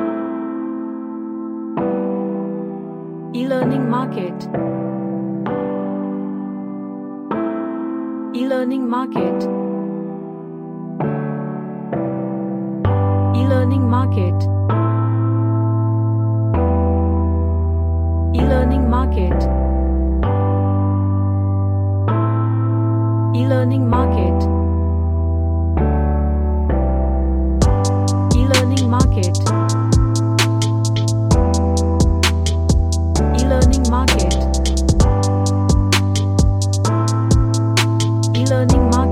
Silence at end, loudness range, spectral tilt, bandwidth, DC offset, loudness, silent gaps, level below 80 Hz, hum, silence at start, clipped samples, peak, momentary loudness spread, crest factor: 0 s; 7 LU; -6.5 dB/octave; 13.5 kHz; under 0.1%; -18 LUFS; none; -22 dBFS; none; 0 s; under 0.1%; 0 dBFS; 10 LU; 16 dB